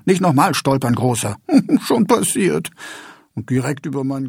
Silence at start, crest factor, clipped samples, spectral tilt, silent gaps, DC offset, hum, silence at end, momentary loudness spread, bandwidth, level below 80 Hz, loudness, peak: 0.05 s; 16 dB; under 0.1%; -5.5 dB/octave; none; under 0.1%; none; 0 s; 17 LU; 17.5 kHz; -56 dBFS; -17 LUFS; -2 dBFS